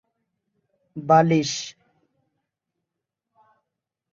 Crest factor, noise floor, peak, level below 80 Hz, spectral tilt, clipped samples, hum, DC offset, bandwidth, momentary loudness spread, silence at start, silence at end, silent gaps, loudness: 22 dB; -84 dBFS; -4 dBFS; -68 dBFS; -5.5 dB/octave; under 0.1%; none; under 0.1%; 7.8 kHz; 21 LU; 0.95 s; 2.45 s; none; -20 LUFS